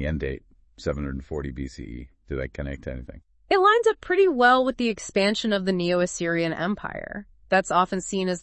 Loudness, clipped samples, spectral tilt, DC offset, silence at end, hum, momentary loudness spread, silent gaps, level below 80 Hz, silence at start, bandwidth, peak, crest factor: -24 LUFS; under 0.1%; -5 dB/octave; under 0.1%; 0 s; none; 17 LU; none; -42 dBFS; 0 s; 8.8 kHz; -6 dBFS; 18 dB